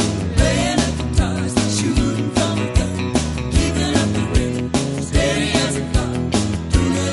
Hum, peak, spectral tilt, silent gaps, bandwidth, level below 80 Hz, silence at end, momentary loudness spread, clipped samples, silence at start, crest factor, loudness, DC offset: none; -2 dBFS; -5 dB/octave; none; 11.5 kHz; -26 dBFS; 0 s; 3 LU; under 0.1%; 0 s; 16 dB; -19 LUFS; under 0.1%